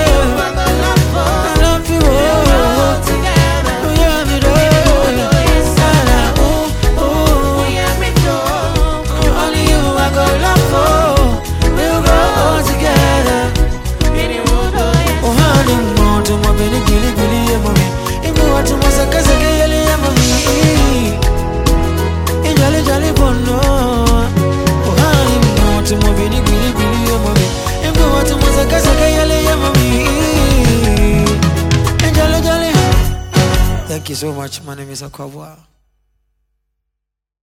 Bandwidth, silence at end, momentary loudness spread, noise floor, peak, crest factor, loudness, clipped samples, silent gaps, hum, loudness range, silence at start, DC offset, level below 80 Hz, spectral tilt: 17 kHz; 1.9 s; 5 LU; -79 dBFS; 0 dBFS; 12 dB; -12 LUFS; under 0.1%; none; none; 2 LU; 0 s; under 0.1%; -16 dBFS; -5 dB/octave